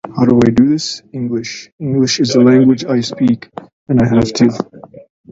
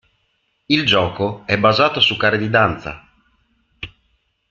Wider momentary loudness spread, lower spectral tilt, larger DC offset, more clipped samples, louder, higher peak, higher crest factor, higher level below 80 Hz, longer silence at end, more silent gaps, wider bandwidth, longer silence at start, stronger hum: second, 15 LU vs 21 LU; about the same, -6 dB/octave vs -5.5 dB/octave; neither; neither; first, -13 LUFS vs -16 LUFS; about the same, 0 dBFS vs 0 dBFS; second, 14 dB vs 20 dB; first, -42 dBFS vs -50 dBFS; second, 0.3 s vs 0.65 s; first, 1.72-1.78 s, 3.73-3.86 s vs none; about the same, 7.8 kHz vs 7.6 kHz; second, 0.05 s vs 0.7 s; neither